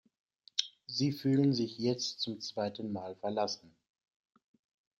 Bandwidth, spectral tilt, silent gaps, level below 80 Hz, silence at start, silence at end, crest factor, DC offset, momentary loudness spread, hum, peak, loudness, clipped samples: 16 kHz; -5.5 dB/octave; none; -78 dBFS; 0.55 s; 1.3 s; 24 dB; under 0.1%; 10 LU; none; -12 dBFS; -34 LUFS; under 0.1%